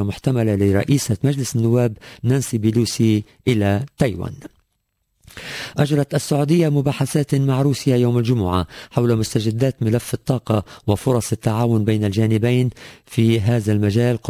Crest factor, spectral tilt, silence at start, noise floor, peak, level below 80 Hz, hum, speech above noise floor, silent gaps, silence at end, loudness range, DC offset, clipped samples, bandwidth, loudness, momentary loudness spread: 16 dB; -6.5 dB/octave; 0 s; -71 dBFS; -4 dBFS; -42 dBFS; none; 53 dB; none; 0 s; 3 LU; under 0.1%; under 0.1%; 16 kHz; -19 LUFS; 6 LU